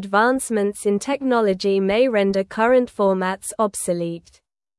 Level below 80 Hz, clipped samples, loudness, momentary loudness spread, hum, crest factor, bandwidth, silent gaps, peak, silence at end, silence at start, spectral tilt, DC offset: -56 dBFS; under 0.1%; -20 LUFS; 6 LU; none; 16 dB; 12 kHz; none; -4 dBFS; 0.6 s; 0 s; -5 dB/octave; under 0.1%